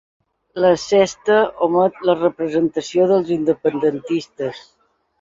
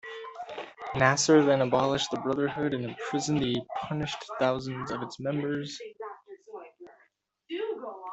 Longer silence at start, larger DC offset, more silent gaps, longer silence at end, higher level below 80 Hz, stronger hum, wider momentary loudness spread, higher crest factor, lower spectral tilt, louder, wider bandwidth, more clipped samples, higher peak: first, 0.55 s vs 0.05 s; neither; neither; first, 0.6 s vs 0 s; about the same, -58 dBFS vs -62 dBFS; neither; second, 8 LU vs 19 LU; second, 16 dB vs 24 dB; about the same, -5.5 dB/octave vs -4.5 dB/octave; first, -18 LUFS vs -28 LUFS; about the same, 7.8 kHz vs 8.2 kHz; neither; first, -2 dBFS vs -6 dBFS